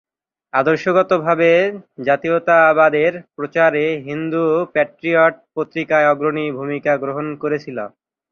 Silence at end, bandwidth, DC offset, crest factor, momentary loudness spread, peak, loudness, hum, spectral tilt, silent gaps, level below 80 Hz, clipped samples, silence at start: 0.45 s; 7 kHz; under 0.1%; 16 dB; 11 LU; -2 dBFS; -17 LUFS; none; -7 dB/octave; none; -64 dBFS; under 0.1%; 0.55 s